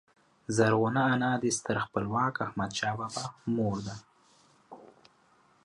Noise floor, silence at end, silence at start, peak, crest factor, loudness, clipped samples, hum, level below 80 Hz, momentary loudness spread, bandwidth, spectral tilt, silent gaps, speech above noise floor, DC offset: -65 dBFS; 0.8 s; 0.5 s; -12 dBFS; 20 dB; -30 LUFS; under 0.1%; none; -64 dBFS; 11 LU; 11.5 kHz; -5 dB/octave; none; 35 dB; under 0.1%